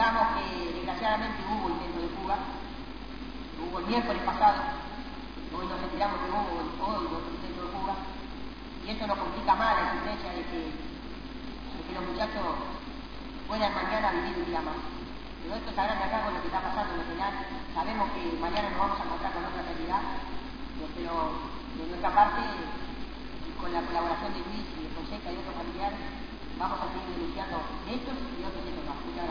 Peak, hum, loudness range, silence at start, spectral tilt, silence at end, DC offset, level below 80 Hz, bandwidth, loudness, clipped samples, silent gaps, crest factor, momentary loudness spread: -10 dBFS; none; 5 LU; 0 s; -6 dB/octave; 0 s; 0.5%; -44 dBFS; 5.4 kHz; -32 LUFS; under 0.1%; none; 22 dB; 13 LU